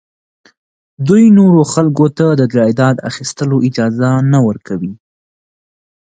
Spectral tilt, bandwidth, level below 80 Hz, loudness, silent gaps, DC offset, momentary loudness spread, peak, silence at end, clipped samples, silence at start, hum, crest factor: -7 dB/octave; 9.4 kHz; -54 dBFS; -11 LUFS; none; under 0.1%; 13 LU; 0 dBFS; 1.2 s; under 0.1%; 1 s; none; 12 dB